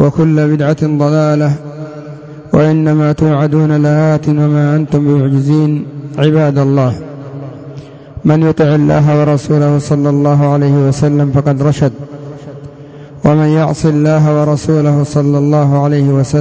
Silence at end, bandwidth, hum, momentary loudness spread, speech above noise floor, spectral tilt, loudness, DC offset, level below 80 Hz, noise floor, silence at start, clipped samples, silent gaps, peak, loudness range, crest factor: 0 s; 8 kHz; none; 17 LU; 22 dB; -8.5 dB/octave; -11 LUFS; under 0.1%; -40 dBFS; -31 dBFS; 0 s; under 0.1%; none; 0 dBFS; 3 LU; 10 dB